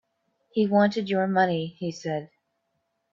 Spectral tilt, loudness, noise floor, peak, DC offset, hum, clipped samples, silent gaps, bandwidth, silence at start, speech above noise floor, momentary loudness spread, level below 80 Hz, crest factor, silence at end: -6.5 dB/octave; -25 LUFS; -76 dBFS; -8 dBFS; under 0.1%; none; under 0.1%; none; 7.4 kHz; 0.55 s; 52 dB; 11 LU; -72 dBFS; 18 dB; 0.85 s